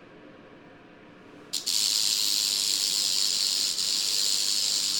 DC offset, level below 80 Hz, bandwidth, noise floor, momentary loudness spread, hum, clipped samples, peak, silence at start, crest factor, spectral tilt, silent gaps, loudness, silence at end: under 0.1%; -70 dBFS; 17.5 kHz; -50 dBFS; 2 LU; none; under 0.1%; -8 dBFS; 0 s; 20 dB; 2 dB/octave; none; -23 LUFS; 0 s